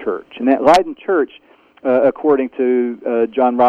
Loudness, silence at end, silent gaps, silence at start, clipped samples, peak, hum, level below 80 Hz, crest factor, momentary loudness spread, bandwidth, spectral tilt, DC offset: -16 LUFS; 0 s; none; 0 s; under 0.1%; 0 dBFS; none; -58 dBFS; 16 dB; 8 LU; 12 kHz; -5.5 dB/octave; under 0.1%